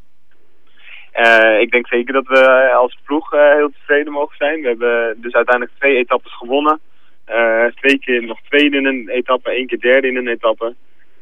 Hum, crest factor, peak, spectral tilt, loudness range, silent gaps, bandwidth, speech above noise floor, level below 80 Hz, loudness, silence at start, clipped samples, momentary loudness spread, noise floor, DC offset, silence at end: none; 14 dB; 0 dBFS; -3.5 dB/octave; 4 LU; none; 9 kHz; 48 dB; -72 dBFS; -14 LUFS; 0.9 s; under 0.1%; 10 LU; -62 dBFS; 2%; 0.5 s